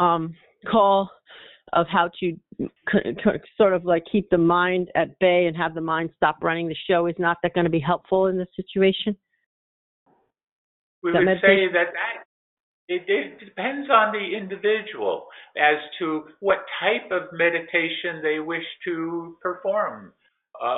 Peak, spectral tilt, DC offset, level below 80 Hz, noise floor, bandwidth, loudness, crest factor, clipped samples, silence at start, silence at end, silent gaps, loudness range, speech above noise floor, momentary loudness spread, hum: -4 dBFS; -3.5 dB/octave; under 0.1%; -58 dBFS; -48 dBFS; 4.1 kHz; -23 LUFS; 20 dB; under 0.1%; 0 s; 0 s; 9.46-10.06 s, 10.51-11.02 s, 12.25-12.88 s; 4 LU; 25 dB; 11 LU; none